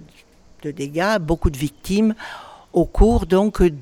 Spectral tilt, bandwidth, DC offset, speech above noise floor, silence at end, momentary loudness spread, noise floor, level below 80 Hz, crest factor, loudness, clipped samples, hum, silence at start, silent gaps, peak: -6.5 dB/octave; 16.5 kHz; under 0.1%; 31 dB; 0 s; 16 LU; -49 dBFS; -26 dBFS; 18 dB; -20 LUFS; under 0.1%; none; 0.65 s; none; 0 dBFS